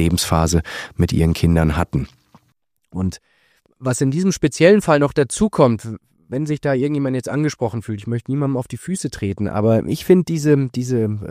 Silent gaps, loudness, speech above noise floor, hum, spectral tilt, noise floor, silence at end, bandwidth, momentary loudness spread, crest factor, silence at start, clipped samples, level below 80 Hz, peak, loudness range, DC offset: none; -19 LUFS; 48 dB; none; -6 dB/octave; -66 dBFS; 0 s; 15.5 kHz; 11 LU; 18 dB; 0 s; under 0.1%; -36 dBFS; 0 dBFS; 5 LU; under 0.1%